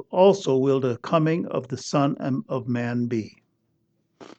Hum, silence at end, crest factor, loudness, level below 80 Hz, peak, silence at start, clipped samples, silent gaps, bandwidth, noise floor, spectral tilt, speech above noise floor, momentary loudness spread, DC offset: none; 0.15 s; 18 dB; -24 LUFS; -72 dBFS; -6 dBFS; 0 s; under 0.1%; none; 8.4 kHz; -70 dBFS; -7 dB/octave; 48 dB; 10 LU; under 0.1%